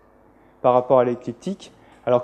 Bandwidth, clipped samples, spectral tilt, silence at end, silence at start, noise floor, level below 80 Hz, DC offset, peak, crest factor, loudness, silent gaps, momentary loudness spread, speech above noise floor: 9 kHz; under 0.1%; -7.5 dB/octave; 0 s; 0.65 s; -53 dBFS; -62 dBFS; under 0.1%; -4 dBFS; 18 dB; -21 LUFS; none; 15 LU; 34 dB